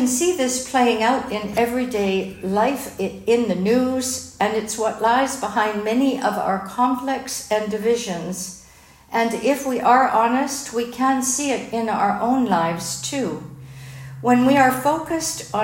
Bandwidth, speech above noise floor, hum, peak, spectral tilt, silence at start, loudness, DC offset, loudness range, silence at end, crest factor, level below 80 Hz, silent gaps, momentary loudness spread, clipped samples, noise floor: 16.5 kHz; 28 dB; none; -4 dBFS; -4 dB/octave; 0 s; -20 LUFS; under 0.1%; 3 LU; 0 s; 18 dB; -54 dBFS; none; 9 LU; under 0.1%; -48 dBFS